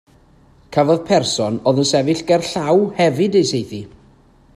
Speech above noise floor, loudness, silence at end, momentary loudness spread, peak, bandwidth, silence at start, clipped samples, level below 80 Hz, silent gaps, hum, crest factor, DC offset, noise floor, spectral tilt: 34 dB; -17 LUFS; 0.7 s; 7 LU; 0 dBFS; 14 kHz; 0.7 s; under 0.1%; -54 dBFS; none; none; 16 dB; under 0.1%; -50 dBFS; -5 dB/octave